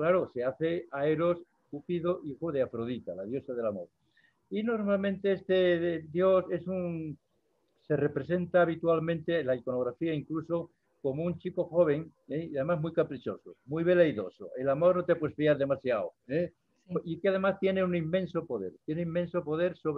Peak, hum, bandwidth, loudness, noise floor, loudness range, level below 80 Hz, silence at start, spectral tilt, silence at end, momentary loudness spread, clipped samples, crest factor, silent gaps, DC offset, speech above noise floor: -12 dBFS; none; 5.2 kHz; -31 LUFS; -75 dBFS; 4 LU; -70 dBFS; 0 s; -9.5 dB/octave; 0 s; 11 LU; under 0.1%; 18 dB; none; under 0.1%; 45 dB